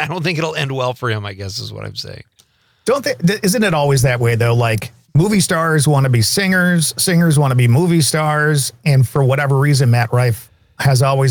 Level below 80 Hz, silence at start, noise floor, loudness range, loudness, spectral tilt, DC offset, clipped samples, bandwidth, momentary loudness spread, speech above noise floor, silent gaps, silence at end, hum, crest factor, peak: -46 dBFS; 0 s; -55 dBFS; 6 LU; -15 LUFS; -5 dB/octave; under 0.1%; under 0.1%; 19.5 kHz; 11 LU; 41 dB; none; 0 s; none; 10 dB; -4 dBFS